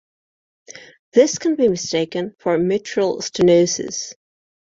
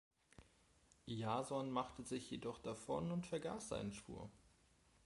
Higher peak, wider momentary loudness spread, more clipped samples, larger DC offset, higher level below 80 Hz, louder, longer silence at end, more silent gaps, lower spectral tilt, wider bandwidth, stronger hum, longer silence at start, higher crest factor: first, -2 dBFS vs -26 dBFS; about the same, 10 LU vs 11 LU; neither; neither; first, -58 dBFS vs -70 dBFS; first, -19 LUFS vs -46 LUFS; about the same, 0.55 s vs 0.55 s; first, 0.99-1.12 s vs none; about the same, -4.5 dB/octave vs -5.5 dB/octave; second, 7.8 kHz vs 11.5 kHz; neither; first, 0.7 s vs 0.4 s; about the same, 18 dB vs 20 dB